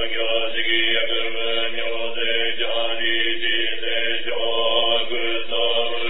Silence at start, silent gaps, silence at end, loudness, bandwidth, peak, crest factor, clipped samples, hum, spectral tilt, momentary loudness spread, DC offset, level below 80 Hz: 0 s; none; 0 s; -21 LUFS; 4.1 kHz; -6 dBFS; 16 dB; under 0.1%; none; -5.5 dB/octave; 4 LU; 8%; -60 dBFS